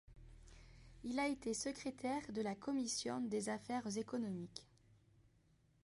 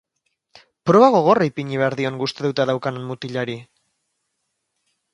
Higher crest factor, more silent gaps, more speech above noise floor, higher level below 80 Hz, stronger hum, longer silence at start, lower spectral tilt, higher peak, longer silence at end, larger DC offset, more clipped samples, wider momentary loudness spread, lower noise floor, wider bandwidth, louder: about the same, 18 dB vs 20 dB; neither; second, 31 dB vs 57 dB; about the same, -68 dBFS vs -64 dBFS; neither; second, 0.1 s vs 0.85 s; second, -4 dB/octave vs -6.5 dB/octave; second, -28 dBFS vs 0 dBFS; second, 1.2 s vs 1.5 s; neither; neither; first, 22 LU vs 14 LU; about the same, -74 dBFS vs -75 dBFS; about the same, 11.5 kHz vs 10.5 kHz; second, -43 LUFS vs -19 LUFS